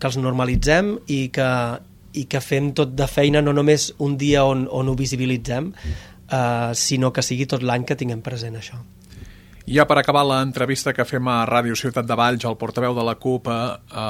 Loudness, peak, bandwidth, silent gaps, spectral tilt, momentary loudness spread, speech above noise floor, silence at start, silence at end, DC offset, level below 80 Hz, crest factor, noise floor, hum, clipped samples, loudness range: -20 LUFS; 0 dBFS; 16 kHz; none; -5 dB/octave; 12 LU; 21 dB; 0 s; 0 s; under 0.1%; -38 dBFS; 20 dB; -41 dBFS; none; under 0.1%; 4 LU